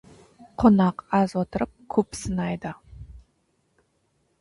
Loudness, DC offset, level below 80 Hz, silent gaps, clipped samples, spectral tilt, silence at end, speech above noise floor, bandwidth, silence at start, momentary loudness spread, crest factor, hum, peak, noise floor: -24 LUFS; under 0.1%; -48 dBFS; none; under 0.1%; -7 dB/octave; 1.2 s; 47 dB; 11.5 kHz; 0.4 s; 24 LU; 20 dB; none; -6 dBFS; -70 dBFS